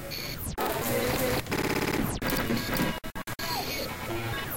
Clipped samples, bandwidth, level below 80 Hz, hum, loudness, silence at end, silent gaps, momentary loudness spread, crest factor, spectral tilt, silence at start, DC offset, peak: under 0.1%; 17 kHz; -44 dBFS; none; -30 LUFS; 0 s; none; 6 LU; 16 dB; -4 dB/octave; 0 s; under 0.1%; -14 dBFS